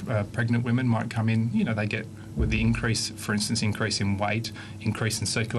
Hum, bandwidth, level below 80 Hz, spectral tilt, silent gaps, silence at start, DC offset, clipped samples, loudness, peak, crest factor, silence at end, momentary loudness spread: none; 12.5 kHz; -40 dBFS; -5 dB/octave; none; 0 s; under 0.1%; under 0.1%; -27 LUFS; -12 dBFS; 14 dB; 0 s; 6 LU